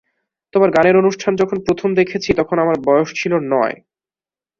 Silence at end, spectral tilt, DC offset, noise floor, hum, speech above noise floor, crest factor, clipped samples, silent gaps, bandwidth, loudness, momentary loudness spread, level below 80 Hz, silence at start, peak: 0.85 s; -6 dB/octave; under 0.1%; under -90 dBFS; none; over 75 dB; 16 dB; under 0.1%; none; 7.4 kHz; -16 LUFS; 6 LU; -50 dBFS; 0.55 s; -2 dBFS